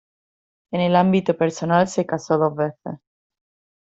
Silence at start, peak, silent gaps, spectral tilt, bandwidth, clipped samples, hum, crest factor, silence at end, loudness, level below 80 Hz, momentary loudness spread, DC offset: 0.7 s; -4 dBFS; none; -6.5 dB/octave; 8 kHz; under 0.1%; none; 18 dB; 0.9 s; -20 LUFS; -60 dBFS; 15 LU; under 0.1%